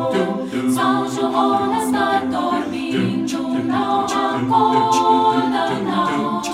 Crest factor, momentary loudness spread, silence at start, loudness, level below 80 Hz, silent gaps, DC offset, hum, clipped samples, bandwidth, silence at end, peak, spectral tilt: 14 dB; 6 LU; 0 s; -18 LUFS; -56 dBFS; none; under 0.1%; none; under 0.1%; 15 kHz; 0 s; -4 dBFS; -5 dB/octave